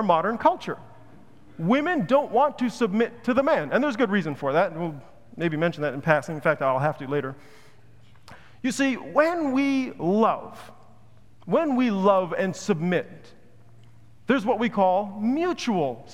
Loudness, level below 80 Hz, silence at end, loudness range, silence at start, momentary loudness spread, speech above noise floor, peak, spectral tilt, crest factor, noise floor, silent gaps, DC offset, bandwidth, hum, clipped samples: -24 LUFS; -64 dBFS; 0 s; 3 LU; 0 s; 9 LU; 31 dB; -4 dBFS; -6 dB/octave; 22 dB; -55 dBFS; none; 0.4%; 14 kHz; none; under 0.1%